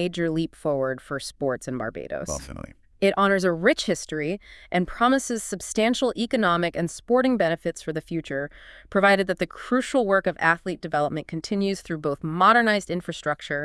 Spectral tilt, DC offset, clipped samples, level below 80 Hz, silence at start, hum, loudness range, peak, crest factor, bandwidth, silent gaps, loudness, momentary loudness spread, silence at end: -4.5 dB/octave; under 0.1%; under 0.1%; -52 dBFS; 0 s; none; 2 LU; -4 dBFS; 20 dB; 12 kHz; none; -24 LUFS; 11 LU; 0 s